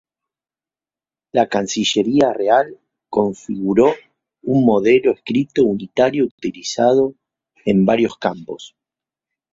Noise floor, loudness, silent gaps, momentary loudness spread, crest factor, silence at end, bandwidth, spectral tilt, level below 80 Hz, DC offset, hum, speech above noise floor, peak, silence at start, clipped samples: under -90 dBFS; -17 LUFS; 6.31-6.38 s; 11 LU; 16 dB; 0.85 s; 7.8 kHz; -5.5 dB/octave; -56 dBFS; under 0.1%; none; over 74 dB; -2 dBFS; 1.35 s; under 0.1%